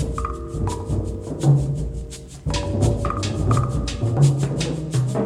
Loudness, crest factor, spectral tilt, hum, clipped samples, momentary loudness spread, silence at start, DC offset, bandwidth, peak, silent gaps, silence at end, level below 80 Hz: -22 LUFS; 16 dB; -6.5 dB/octave; none; under 0.1%; 10 LU; 0 s; under 0.1%; 11.5 kHz; -4 dBFS; none; 0 s; -32 dBFS